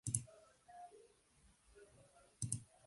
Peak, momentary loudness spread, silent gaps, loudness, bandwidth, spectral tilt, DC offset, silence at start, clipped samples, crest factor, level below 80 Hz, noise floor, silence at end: -18 dBFS; 25 LU; none; -46 LUFS; 11.5 kHz; -4 dB/octave; under 0.1%; 0.05 s; under 0.1%; 32 dB; -70 dBFS; -72 dBFS; 0.2 s